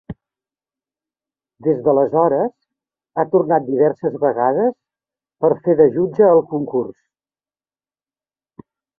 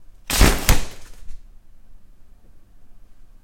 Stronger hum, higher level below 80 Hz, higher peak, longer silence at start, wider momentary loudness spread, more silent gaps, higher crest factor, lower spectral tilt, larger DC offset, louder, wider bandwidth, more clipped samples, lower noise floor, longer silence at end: first, 50 Hz at -50 dBFS vs none; second, -60 dBFS vs -26 dBFS; about the same, 0 dBFS vs 0 dBFS; about the same, 0.1 s vs 0 s; second, 10 LU vs 22 LU; neither; about the same, 18 dB vs 22 dB; first, -12 dB/octave vs -3.5 dB/octave; neither; about the same, -17 LUFS vs -19 LUFS; second, 2.2 kHz vs 16.5 kHz; neither; first, under -90 dBFS vs -44 dBFS; first, 2.05 s vs 0.2 s